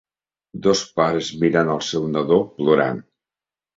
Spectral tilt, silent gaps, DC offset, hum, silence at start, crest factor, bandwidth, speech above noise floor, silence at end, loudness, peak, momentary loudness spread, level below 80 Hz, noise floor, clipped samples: -5 dB/octave; none; under 0.1%; none; 0.55 s; 18 dB; 8 kHz; over 71 dB; 0.75 s; -20 LUFS; -2 dBFS; 5 LU; -56 dBFS; under -90 dBFS; under 0.1%